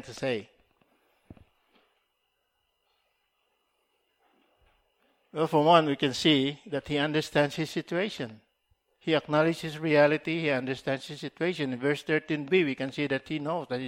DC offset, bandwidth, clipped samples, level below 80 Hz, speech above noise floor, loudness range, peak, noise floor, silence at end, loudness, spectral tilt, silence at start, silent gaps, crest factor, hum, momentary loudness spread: under 0.1%; 15.5 kHz; under 0.1%; -66 dBFS; 50 dB; 4 LU; -6 dBFS; -77 dBFS; 0 s; -28 LUFS; -5.5 dB/octave; 0.05 s; none; 22 dB; none; 11 LU